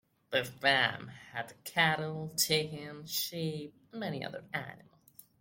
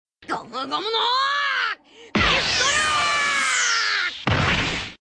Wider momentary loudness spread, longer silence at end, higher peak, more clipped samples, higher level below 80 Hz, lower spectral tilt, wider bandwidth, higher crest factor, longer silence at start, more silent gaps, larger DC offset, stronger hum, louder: first, 15 LU vs 10 LU; first, 0.6 s vs 0.05 s; second, -12 dBFS vs -8 dBFS; neither; second, -72 dBFS vs -42 dBFS; about the same, -3 dB/octave vs -2 dB/octave; first, 16.5 kHz vs 10.5 kHz; first, 24 dB vs 14 dB; about the same, 0.3 s vs 0.2 s; neither; neither; neither; second, -33 LUFS vs -20 LUFS